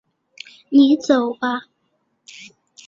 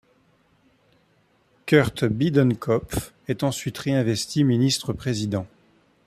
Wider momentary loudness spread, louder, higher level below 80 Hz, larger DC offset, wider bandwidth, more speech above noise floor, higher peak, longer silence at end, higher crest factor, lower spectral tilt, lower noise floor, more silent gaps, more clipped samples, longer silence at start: first, 25 LU vs 11 LU; first, -17 LUFS vs -23 LUFS; second, -68 dBFS vs -50 dBFS; neither; second, 7.6 kHz vs 15 kHz; first, 53 dB vs 41 dB; about the same, -4 dBFS vs -4 dBFS; first, 1.25 s vs 0.6 s; about the same, 18 dB vs 20 dB; second, -4 dB/octave vs -5.5 dB/octave; first, -69 dBFS vs -63 dBFS; neither; neither; second, 0.7 s vs 1.65 s